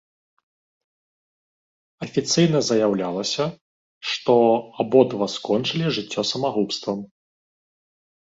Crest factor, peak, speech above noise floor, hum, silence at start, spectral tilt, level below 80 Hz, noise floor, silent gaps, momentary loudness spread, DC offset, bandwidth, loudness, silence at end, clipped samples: 20 dB; -4 dBFS; over 69 dB; none; 2 s; -5 dB/octave; -64 dBFS; under -90 dBFS; 3.61-4.01 s; 10 LU; under 0.1%; 7.8 kHz; -21 LUFS; 1.25 s; under 0.1%